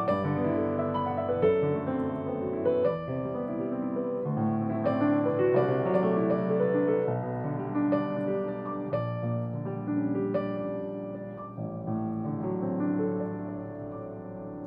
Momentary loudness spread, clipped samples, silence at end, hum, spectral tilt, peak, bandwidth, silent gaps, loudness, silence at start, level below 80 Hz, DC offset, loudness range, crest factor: 11 LU; under 0.1%; 0 s; none; -11 dB/octave; -12 dBFS; 5.2 kHz; none; -29 LUFS; 0 s; -64 dBFS; under 0.1%; 6 LU; 16 dB